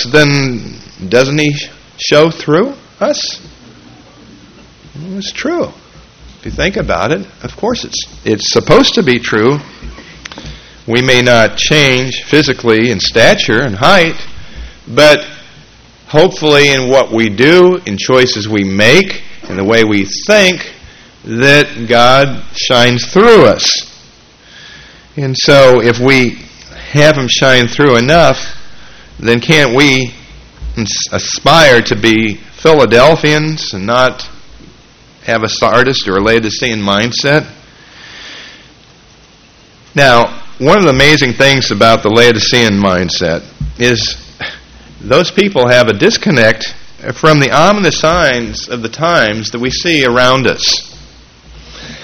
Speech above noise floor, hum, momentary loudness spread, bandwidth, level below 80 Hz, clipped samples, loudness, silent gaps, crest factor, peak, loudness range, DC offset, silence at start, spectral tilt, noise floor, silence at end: 33 dB; none; 17 LU; 18.5 kHz; -34 dBFS; 1%; -9 LUFS; none; 10 dB; 0 dBFS; 7 LU; under 0.1%; 0 s; -4 dB/octave; -42 dBFS; 0 s